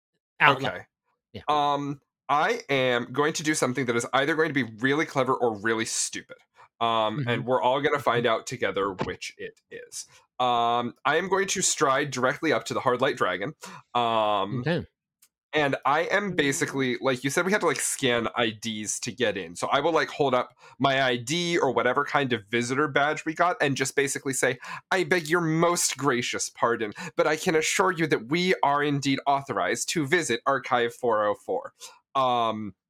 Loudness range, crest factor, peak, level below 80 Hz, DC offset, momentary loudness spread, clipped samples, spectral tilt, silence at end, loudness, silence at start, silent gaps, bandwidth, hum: 2 LU; 24 dB; -2 dBFS; -66 dBFS; under 0.1%; 8 LU; under 0.1%; -3.5 dB/octave; 0.2 s; -25 LUFS; 0.4 s; 15.43-15.49 s; 17.5 kHz; none